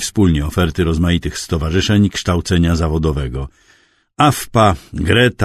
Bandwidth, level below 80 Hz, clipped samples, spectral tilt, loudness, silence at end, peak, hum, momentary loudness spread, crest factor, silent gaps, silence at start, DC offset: 13.5 kHz; -28 dBFS; under 0.1%; -5.5 dB/octave; -16 LUFS; 0 s; 0 dBFS; none; 8 LU; 16 dB; none; 0 s; under 0.1%